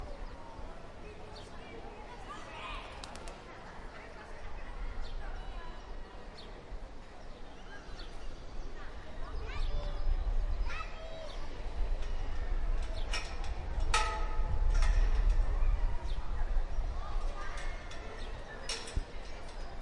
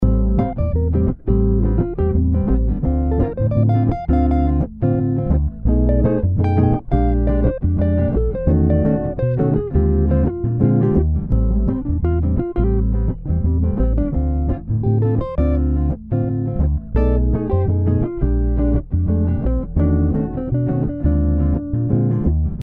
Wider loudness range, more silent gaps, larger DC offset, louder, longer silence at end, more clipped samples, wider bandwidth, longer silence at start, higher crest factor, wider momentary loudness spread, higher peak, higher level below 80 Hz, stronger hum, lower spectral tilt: first, 13 LU vs 2 LU; neither; neither; second, -41 LUFS vs -19 LUFS; about the same, 0 s vs 0 s; neither; first, 11 kHz vs 3.7 kHz; about the same, 0 s vs 0 s; first, 20 dB vs 14 dB; first, 15 LU vs 4 LU; second, -14 dBFS vs -2 dBFS; second, -36 dBFS vs -20 dBFS; neither; second, -4.5 dB/octave vs -13 dB/octave